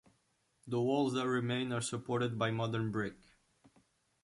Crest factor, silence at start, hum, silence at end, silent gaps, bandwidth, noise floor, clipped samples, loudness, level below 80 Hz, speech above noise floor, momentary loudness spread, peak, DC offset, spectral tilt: 18 dB; 0.65 s; none; 1.1 s; none; 11.5 kHz; -77 dBFS; under 0.1%; -35 LUFS; -70 dBFS; 42 dB; 6 LU; -20 dBFS; under 0.1%; -5.5 dB/octave